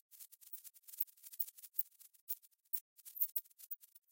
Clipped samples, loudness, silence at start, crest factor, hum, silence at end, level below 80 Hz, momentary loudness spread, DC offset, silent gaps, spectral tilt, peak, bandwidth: under 0.1%; -42 LUFS; 0.1 s; 26 dB; none; 0.15 s; under -90 dBFS; 16 LU; under 0.1%; 2.21-2.27 s, 2.81-2.96 s; 3 dB/octave; -20 dBFS; 17 kHz